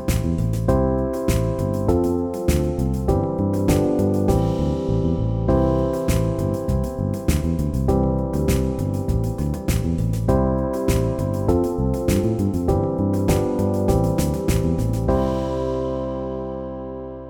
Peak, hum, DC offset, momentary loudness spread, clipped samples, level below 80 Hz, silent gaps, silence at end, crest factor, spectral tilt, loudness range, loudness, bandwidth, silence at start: -4 dBFS; none; under 0.1%; 4 LU; under 0.1%; -28 dBFS; none; 0 s; 16 dB; -7.5 dB/octave; 2 LU; -21 LUFS; 20 kHz; 0 s